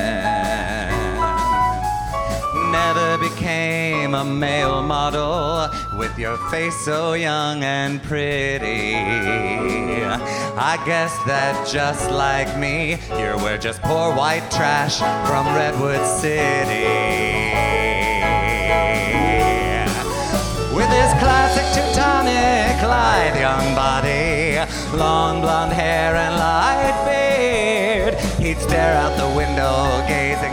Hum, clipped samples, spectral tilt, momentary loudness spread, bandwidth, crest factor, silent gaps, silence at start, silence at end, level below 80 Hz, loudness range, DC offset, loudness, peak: none; under 0.1%; -4.5 dB/octave; 6 LU; over 20 kHz; 16 dB; none; 0 s; 0 s; -30 dBFS; 4 LU; under 0.1%; -19 LUFS; -2 dBFS